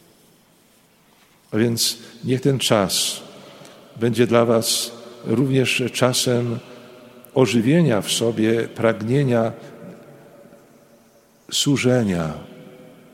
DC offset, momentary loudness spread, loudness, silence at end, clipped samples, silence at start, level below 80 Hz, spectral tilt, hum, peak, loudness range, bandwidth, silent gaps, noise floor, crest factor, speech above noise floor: under 0.1%; 15 LU; -20 LUFS; 0.3 s; under 0.1%; 1.5 s; -58 dBFS; -4.5 dB/octave; none; -2 dBFS; 4 LU; 16.5 kHz; none; -56 dBFS; 20 dB; 37 dB